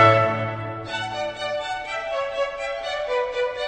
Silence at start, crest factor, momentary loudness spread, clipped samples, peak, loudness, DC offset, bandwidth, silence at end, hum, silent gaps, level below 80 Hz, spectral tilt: 0 s; 22 dB; 7 LU; under 0.1%; -2 dBFS; -25 LUFS; under 0.1%; 8.8 kHz; 0 s; none; none; -54 dBFS; -5 dB/octave